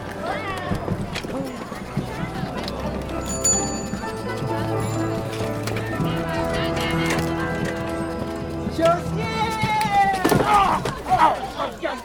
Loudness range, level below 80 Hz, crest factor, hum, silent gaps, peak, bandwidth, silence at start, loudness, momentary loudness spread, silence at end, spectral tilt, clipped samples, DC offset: 5 LU; -40 dBFS; 20 dB; none; none; -4 dBFS; over 20 kHz; 0 s; -23 LUFS; 10 LU; 0 s; -4.5 dB/octave; under 0.1%; under 0.1%